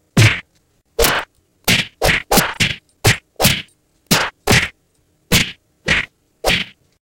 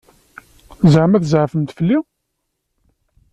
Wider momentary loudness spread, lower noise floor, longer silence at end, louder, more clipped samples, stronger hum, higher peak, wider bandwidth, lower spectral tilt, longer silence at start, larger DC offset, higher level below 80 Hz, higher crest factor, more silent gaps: first, 11 LU vs 8 LU; second, -60 dBFS vs -73 dBFS; second, 0.35 s vs 1.3 s; about the same, -16 LUFS vs -15 LUFS; neither; neither; about the same, 0 dBFS vs -2 dBFS; first, 17 kHz vs 8.8 kHz; second, -3 dB/octave vs -8 dB/octave; second, 0.15 s vs 0.8 s; neither; first, -34 dBFS vs -50 dBFS; about the same, 18 dB vs 16 dB; neither